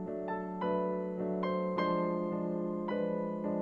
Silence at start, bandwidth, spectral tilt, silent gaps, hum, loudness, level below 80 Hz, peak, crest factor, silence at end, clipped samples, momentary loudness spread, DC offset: 0 s; 5.6 kHz; -9.5 dB/octave; none; none; -35 LUFS; -70 dBFS; -20 dBFS; 14 dB; 0 s; under 0.1%; 4 LU; under 0.1%